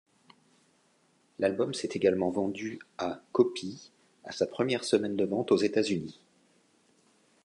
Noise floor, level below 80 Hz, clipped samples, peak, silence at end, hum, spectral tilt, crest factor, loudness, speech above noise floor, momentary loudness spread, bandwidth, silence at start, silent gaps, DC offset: -68 dBFS; -68 dBFS; under 0.1%; -10 dBFS; 1.3 s; none; -5 dB/octave; 22 dB; -30 LUFS; 39 dB; 13 LU; 11 kHz; 1.4 s; none; under 0.1%